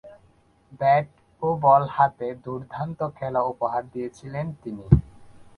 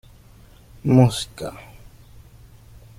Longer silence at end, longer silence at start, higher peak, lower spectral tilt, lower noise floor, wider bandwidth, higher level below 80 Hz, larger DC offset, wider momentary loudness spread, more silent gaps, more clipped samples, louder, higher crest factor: second, 0.15 s vs 1.35 s; second, 0.05 s vs 0.85 s; about the same, 0 dBFS vs -2 dBFS; first, -9 dB/octave vs -7 dB/octave; first, -59 dBFS vs -48 dBFS; second, 6.8 kHz vs 15 kHz; first, -40 dBFS vs -48 dBFS; neither; about the same, 16 LU vs 18 LU; neither; neither; second, -24 LUFS vs -19 LUFS; about the same, 24 dB vs 22 dB